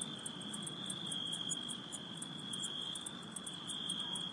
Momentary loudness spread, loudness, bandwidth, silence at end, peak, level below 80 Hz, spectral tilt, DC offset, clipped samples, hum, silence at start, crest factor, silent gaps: 6 LU; -41 LUFS; 11.5 kHz; 0 s; -26 dBFS; -80 dBFS; -2 dB/octave; under 0.1%; under 0.1%; none; 0 s; 18 dB; none